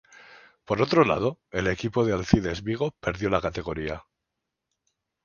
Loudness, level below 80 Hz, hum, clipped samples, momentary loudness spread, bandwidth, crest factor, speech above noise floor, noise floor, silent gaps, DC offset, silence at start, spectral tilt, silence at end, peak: -26 LUFS; -46 dBFS; none; under 0.1%; 11 LU; 7.2 kHz; 24 dB; 58 dB; -83 dBFS; none; under 0.1%; 0.3 s; -6.5 dB/octave; 1.25 s; -2 dBFS